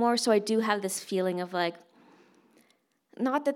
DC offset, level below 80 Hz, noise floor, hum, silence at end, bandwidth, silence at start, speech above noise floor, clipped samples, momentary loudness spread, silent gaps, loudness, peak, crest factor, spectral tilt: under 0.1%; under -90 dBFS; -70 dBFS; none; 0 s; 17 kHz; 0 s; 42 dB; under 0.1%; 6 LU; none; -28 LUFS; -10 dBFS; 20 dB; -4 dB/octave